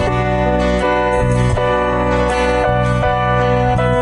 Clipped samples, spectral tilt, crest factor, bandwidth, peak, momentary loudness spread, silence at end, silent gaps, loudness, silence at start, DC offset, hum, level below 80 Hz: under 0.1%; -6.5 dB/octave; 8 dB; 10.5 kHz; -6 dBFS; 1 LU; 0 s; none; -15 LUFS; 0 s; under 0.1%; none; -24 dBFS